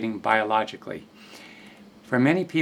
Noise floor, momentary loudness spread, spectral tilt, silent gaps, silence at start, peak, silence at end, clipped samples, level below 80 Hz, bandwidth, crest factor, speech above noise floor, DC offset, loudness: -48 dBFS; 23 LU; -6.5 dB/octave; none; 0 s; -4 dBFS; 0 s; under 0.1%; -70 dBFS; 13.5 kHz; 20 dB; 24 dB; under 0.1%; -23 LUFS